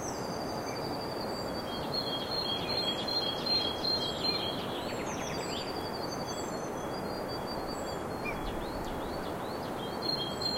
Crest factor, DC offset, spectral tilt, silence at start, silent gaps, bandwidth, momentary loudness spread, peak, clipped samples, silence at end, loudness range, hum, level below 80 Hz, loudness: 16 dB; under 0.1%; -4 dB/octave; 0 s; none; 16 kHz; 7 LU; -18 dBFS; under 0.1%; 0 s; 6 LU; none; -52 dBFS; -34 LUFS